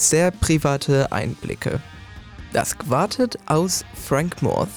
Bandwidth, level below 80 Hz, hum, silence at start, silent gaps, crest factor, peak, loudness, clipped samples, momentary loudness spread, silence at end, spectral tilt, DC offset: over 20 kHz; -40 dBFS; none; 0 s; none; 12 dB; -8 dBFS; -21 LUFS; under 0.1%; 11 LU; 0 s; -4.5 dB/octave; under 0.1%